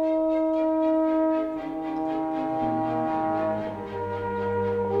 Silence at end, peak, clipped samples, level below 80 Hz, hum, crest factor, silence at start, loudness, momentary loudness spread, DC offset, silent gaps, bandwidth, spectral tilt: 0 s; -14 dBFS; under 0.1%; -56 dBFS; none; 12 dB; 0 s; -26 LUFS; 8 LU; under 0.1%; none; 5.4 kHz; -9 dB/octave